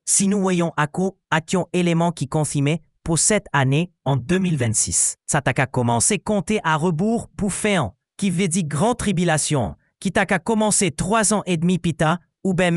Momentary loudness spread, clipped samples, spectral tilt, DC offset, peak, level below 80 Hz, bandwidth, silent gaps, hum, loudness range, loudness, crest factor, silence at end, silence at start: 6 LU; under 0.1%; -4.5 dB/octave; under 0.1%; -2 dBFS; -46 dBFS; 13.5 kHz; none; none; 2 LU; -20 LUFS; 18 dB; 0 s; 0.05 s